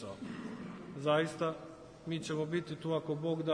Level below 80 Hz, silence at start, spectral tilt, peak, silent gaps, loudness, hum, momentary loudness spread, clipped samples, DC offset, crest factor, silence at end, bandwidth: -72 dBFS; 0 s; -6 dB/octave; -18 dBFS; none; -37 LUFS; none; 14 LU; under 0.1%; under 0.1%; 18 dB; 0 s; 10.5 kHz